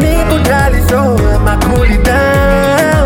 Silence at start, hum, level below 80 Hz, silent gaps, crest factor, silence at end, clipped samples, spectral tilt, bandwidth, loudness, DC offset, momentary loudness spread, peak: 0 s; none; -14 dBFS; none; 8 dB; 0 s; under 0.1%; -6 dB/octave; 17.5 kHz; -10 LUFS; under 0.1%; 2 LU; 0 dBFS